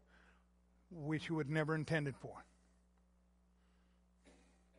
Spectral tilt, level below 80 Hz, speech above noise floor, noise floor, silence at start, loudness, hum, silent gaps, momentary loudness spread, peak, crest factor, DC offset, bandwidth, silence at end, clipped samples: -7 dB/octave; -70 dBFS; 33 dB; -73 dBFS; 0.9 s; -40 LUFS; none; none; 17 LU; -22 dBFS; 24 dB; under 0.1%; 11.5 kHz; 0.5 s; under 0.1%